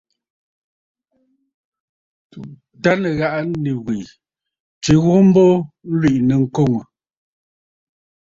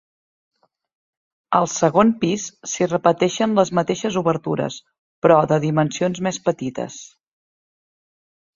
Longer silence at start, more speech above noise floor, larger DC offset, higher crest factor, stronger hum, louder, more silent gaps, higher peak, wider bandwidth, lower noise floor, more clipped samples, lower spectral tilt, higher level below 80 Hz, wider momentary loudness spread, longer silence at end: first, 2.35 s vs 1.5 s; second, 49 dB vs over 71 dB; neither; about the same, 18 dB vs 20 dB; neither; first, -16 LUFS vs -20 LUFS; about the same, 4.60-4.81 s vs 4.98-5.22 s; about the same, -2 dBFS vs -2 dBFS; about the same, 7.8 kHz vs 7.6 kHz; second, -65 dBFS vs under -90 dBFS; neither; first, -7 dB/octave vs -5.5 dB/octave; first, -50 dBFS vs -60 dBFS; about the same, 14 LU vs 12 LU; about the same, 1.55 s vs 1.5 s